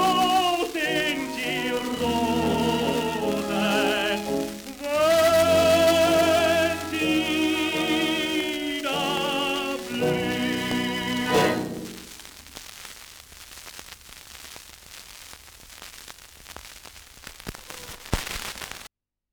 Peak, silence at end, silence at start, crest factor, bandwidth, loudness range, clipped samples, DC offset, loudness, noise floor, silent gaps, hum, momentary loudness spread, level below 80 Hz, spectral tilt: -4 dBFS; 0.45 s; 0 s; 22 dB; over 20 kHz; 21 LU; under 0.1%; under 0.1%; -23 LUFS; -52 dBFS; none; none; 23 LU; -50 dBFS; -4 dB/octave